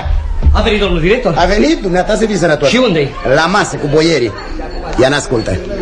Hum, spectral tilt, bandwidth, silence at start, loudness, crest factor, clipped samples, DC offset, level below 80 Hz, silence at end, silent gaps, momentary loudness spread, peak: none; -5 dB/octave; 11 kHz; 0 s; -12 LUFS; 12 dB; under 0.1%; under 0.1%; -20 dBFS; 0 s; none; 8 LU; 0 dBFS